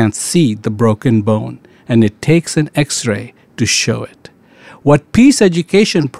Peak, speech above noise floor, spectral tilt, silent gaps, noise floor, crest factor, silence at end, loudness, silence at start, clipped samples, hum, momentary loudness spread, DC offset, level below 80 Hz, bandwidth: 0 dBFS; 28 dB; -5 dB/octave; none; -41 dBFS; 12 dB; 0 s; -13 LUFS; 0 s; under 0.1%; none; 10 LU; 0.4%; -44 dBFS; 15 kHz